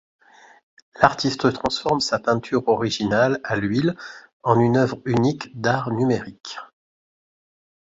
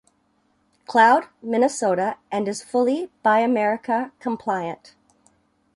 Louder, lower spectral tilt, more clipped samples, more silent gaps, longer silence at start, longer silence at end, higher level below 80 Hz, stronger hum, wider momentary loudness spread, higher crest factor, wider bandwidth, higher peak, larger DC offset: about the same, -21 LUFS vs -21 LUFS; about the same, -5.5 dB/octave vs -4.5 dB/octave; neither; first, 4.33-4.40 s vs none; about the same, 0.95 s vs 0.9 s; first, 1.3 s vs 1 s; first, -54 dBFS vs -70 dBFS; neither; about the same, 11 LU vs 11 LU; about the same, 22 dB vs 18 dB; second, 7.8 kHz vs 11.5 kHz; first, 0 dBFS vs -4 dBFS; neither